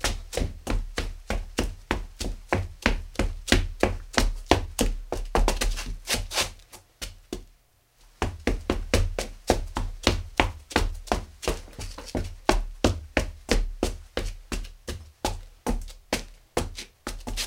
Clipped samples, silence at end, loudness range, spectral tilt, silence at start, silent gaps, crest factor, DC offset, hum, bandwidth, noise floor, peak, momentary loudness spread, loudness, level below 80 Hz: under 0.1%; 0 s; 5 LU; -4 dB/octave; 0 s; none; 28 dB; under 0.1%; none; 16.5 kHz; -61 dBFS; 0 dBFS; 12 LU; -29 LUFS; -32 dBFS